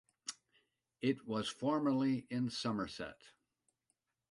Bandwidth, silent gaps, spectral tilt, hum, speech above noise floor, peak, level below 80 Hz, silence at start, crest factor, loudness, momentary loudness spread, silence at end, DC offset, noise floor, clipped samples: 11.5 kHz; none; -5.5 dB/octave; none; 48 dB; -22 dBFS; -74 dBFS; 0.25 s; 18 dB; -38 LUFS; 14 LU; 1 s; under 0.1%; -85 dBFS; under 0.1%